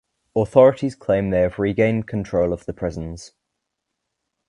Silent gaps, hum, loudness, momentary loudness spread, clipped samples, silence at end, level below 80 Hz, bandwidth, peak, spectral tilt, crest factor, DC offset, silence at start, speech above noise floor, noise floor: none; none; -20 LUFS; 13 LU; under 0.1%; 1.2 s; -44 dBFS; 10.5 kHz; 0 dBFS; -8 dB/octave; 20 dB; under 0.1%; 0.35 s; 60 dB; -79 dBFS